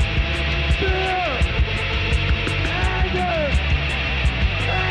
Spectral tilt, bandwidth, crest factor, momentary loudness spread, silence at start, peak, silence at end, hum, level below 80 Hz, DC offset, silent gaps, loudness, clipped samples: -5.5 dB/octave; 9.8 kHz; 12 dB; 1 LU; 0 s; -8 dBFS; 0 s; none; -24 dBFS; under 0.1%; none; -21 LUFS; under 0.1%